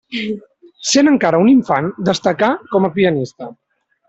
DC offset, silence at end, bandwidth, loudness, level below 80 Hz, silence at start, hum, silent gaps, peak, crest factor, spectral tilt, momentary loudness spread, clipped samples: under 0.1%; 0.55 s; 8.2 kHz; -15 LUFS; -56 dBFS; 0.1 s; none; none; -2 dBFS; 14 dB; -5 dB/octave; 15 LU; under 0.1%